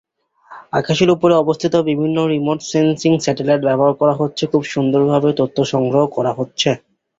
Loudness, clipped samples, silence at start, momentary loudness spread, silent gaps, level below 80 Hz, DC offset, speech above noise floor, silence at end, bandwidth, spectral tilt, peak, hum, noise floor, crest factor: -16 LUFS; under 0.1%; 0.5 s; 5 LU; none; -54 dBFS; under 0.1%; 29 dB; 0.45 s; 7.8 kHz; -6 dB/octave; -2 dBFS; none; -45 dBFS; 14 dB